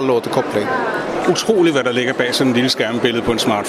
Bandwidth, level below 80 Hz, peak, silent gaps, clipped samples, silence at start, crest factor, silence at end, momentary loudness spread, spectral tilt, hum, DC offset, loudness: 14.5 kHz; -48 dBFS; 0 dBFS; none; under 0.1%; 0 s; 16 dB; 0 s; 5 LU; -4 dB/octave; none; under 0.1%; -16 LUFS